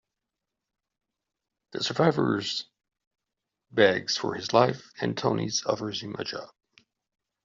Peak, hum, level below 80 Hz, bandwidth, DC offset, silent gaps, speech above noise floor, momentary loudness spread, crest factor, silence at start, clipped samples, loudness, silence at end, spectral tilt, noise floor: -6 dBFS; none; -68 dBFS; 7.6 kHz; under 0.1%; 3.07-3.11 s; 60 dB; 12 LU; 24 dB; 1.75 s; under 0.1%; -27 LUFS; 1 s; -3.5 dB/octave; -86 dBFS